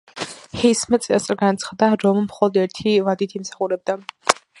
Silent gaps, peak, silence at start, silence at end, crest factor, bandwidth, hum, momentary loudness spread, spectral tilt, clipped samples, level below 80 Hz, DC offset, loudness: none; 0 dBFS; 0.15 s; 0.25 s; 20 dB; 11.5 kHz; none; 9 LU; -4.5 dB/octave; under 0.1%; -56 dBFS; under 0.1%; -20 LUFS